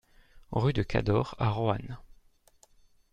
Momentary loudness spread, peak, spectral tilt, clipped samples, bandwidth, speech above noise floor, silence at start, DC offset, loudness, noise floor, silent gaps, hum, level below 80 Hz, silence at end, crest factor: 11 LU; -10 dBFS; -8 dB/octave; under 0.1%; 8.6 kHz; 34 dB; 0.35 s; under 0.1%; -30 LUFS; -63 dBFS; none; none; -48 dBFS; 1.15 s; 22 dB